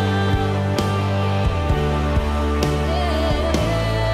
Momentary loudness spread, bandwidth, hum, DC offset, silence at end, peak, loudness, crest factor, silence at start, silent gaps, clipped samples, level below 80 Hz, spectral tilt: 1 LU; 15 kHz; none; under 0.1%; 0 s; -4 dBFS; -20 LUFS; 16 dB; 0 s; none; under 0.1%; -26 dBFS; -6.5 dB/octave